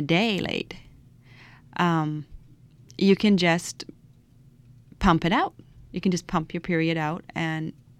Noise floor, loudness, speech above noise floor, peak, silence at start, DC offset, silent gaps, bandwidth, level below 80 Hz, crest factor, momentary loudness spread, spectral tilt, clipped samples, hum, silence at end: -54 dBFS; -25 LUFS; 30 dB; -8 dBFS; 0 s; under 0.1%; none; 13.5 kHz; -46 dBFS; 18 dB; 17 LU; -5.5 dB/octave; under 0.1%; none; 0.3 s